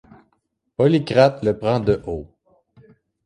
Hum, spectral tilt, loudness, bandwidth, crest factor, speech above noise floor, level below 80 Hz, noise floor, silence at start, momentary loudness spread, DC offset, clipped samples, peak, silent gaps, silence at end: none; -7.5 dB/octave; -19 LUFS; 10.5 kHz; 18 dB; 52 dB; -46 dBFS; -70 dBFS; 0.8 s; 15 LU; under 0.1%; under 0.1%; -2 dBFS; none; 1 s